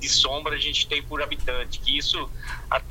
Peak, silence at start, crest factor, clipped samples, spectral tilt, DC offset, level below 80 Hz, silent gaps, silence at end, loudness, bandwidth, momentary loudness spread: -6 dBFS; 0 s; 20 dB; under 0.1%; -1.5 dB/octave; under 0.1%; -34 dBFS; none; 0 s; -24 LUFS; 16.5 kHz; 10 LU